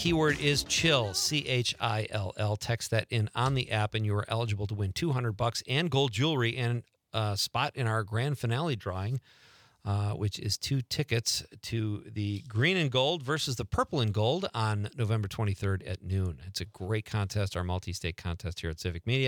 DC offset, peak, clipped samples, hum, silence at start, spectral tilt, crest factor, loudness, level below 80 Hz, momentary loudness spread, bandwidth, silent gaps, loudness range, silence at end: under 0.1%; -10 dBFS; under 0.1%; none; 0 s; -4.5 dB/octave; 20 dB; -30 LUFS; -54 dBFS; 9 LU; 19 kHz; none; 4 LU; 0 s